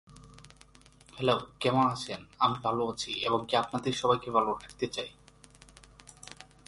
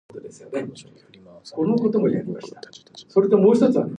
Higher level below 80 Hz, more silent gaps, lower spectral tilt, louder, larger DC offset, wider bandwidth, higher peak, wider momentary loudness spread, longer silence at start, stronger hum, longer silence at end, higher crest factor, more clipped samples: first, -62 dBFS vs -68 dBFS; neither; second, -4.5 dB/octave vs -8 dB/octave; second, -30 LUFS vs -20 LUFS; neither; first, 11.5 kHz vs 9.6 kHz; second, -10 dBFS vs -4 dBFS; second, 19 LU vs 24 LU; about the same, 0.1 s vs 0.15 s; neither; first, 0.25 s vs 0 s; about the same, 22 dB vs 18 dB; neither